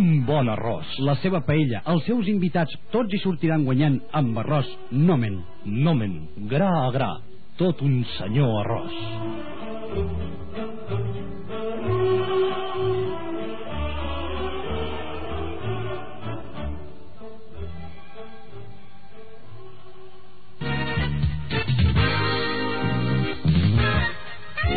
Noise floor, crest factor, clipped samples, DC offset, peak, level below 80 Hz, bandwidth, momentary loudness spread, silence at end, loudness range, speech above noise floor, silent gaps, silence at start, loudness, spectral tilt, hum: -50 dBFS; 16 dB; under 0.1%; 3%; -8 dBFS; -38 dBFS; 4.8 kHz; 16 LU; 0 s; 13 LU; 28 dB; none; 0 s; -25 LUFS; -6 dB/octave; none